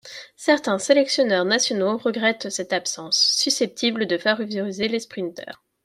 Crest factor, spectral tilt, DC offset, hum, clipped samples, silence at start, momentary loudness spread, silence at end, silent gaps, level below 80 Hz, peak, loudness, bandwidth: 18 dB; -2.5 dB/octave; under 0.1%; none; under 0.1%; 0.05 s; 12 LU; 0.3 s; none; -70 dBFS; -4 dBFS; -21 LUFS; 15.5 kHz